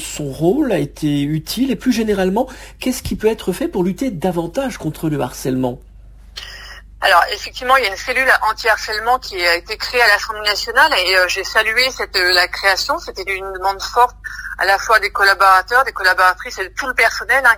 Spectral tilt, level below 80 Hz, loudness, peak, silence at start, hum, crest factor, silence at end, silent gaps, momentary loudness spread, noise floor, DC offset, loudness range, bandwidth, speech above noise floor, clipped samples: -3.5 dB/octave; -40 dBFS; -16 LUFS; 0 dBFS; 0 s; 50 Hz at -55 dBFS; 16 dB; 0 s; none; 11 LU; -36 dBFS; under 0.1%; 6 LU; 16 kHz; 20 dB; under 0.1%